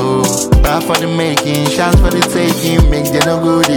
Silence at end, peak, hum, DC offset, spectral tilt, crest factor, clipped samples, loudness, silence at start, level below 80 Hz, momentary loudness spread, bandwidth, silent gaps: 0 s; 0 dBFS; none; under 0.1%; -4.5 dB/octave; 12 dB; under 0.1%; -12 LUFS; 0 s; -18 dBFS; 3 LU; 19 kHz; none